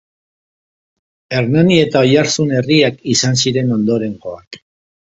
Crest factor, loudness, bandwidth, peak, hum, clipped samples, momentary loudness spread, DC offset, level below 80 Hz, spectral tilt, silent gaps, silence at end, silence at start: 16 dB; -14 LUFS; 8 kHz; 0 dBFS; none; under 0.1%; 12 LU; under 0.1%; -52 dBFS; -5 dB/octave; 4.47-4.51 s; 0.5 s; 1.3 s